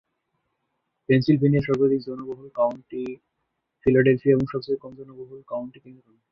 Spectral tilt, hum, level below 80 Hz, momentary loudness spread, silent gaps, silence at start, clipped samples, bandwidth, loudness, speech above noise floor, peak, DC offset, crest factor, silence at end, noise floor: -9.5 dB/octave; none; -54 dBFS; 22 LU; none; 1.1 s; under 0.1%; 6 kHz; -23 LUFS; 55 dB; -6 dBFS; under 0.1%; 18 dB; 0.4 s; -78 dBFS